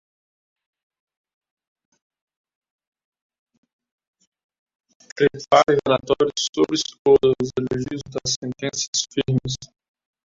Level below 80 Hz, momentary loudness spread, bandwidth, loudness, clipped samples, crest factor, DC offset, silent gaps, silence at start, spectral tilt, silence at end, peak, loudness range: -56 dBFS; 11 LU; 7.8 kHz; -21 LUFS; under 0.1%; 22 dB; under 0.1%; 6.49-6.53 s, 6.99-7.05 s, 8.36-8.42 s, 8.88-8.93 s; 5.15 s; -4 dB/octave; 0.6 s; -2 dBFS; 5 LU